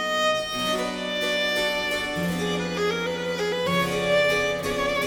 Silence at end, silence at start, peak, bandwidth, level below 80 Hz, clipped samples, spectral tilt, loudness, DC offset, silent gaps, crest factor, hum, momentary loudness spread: 0 s; 0 s; -10 dBFS; 18.5 kHz; -50 dBFS; under 0.1%; -3.5 dB/octave; -24 LUFS; under 0.1%; none; 14 dB; none; 5 LU